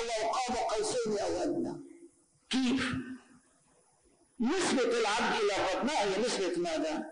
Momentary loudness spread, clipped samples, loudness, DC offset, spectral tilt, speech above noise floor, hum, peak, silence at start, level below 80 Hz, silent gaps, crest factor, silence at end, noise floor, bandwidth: 7 LU; under 0.1%; -31 LUFS; under 0.1%; -3.5 dB/octave; 37 dB; none; -22 dBFS; 0 s; -60 dBFS; none; 10 dB; 0 s; -67 dBFS; 10.5 kHz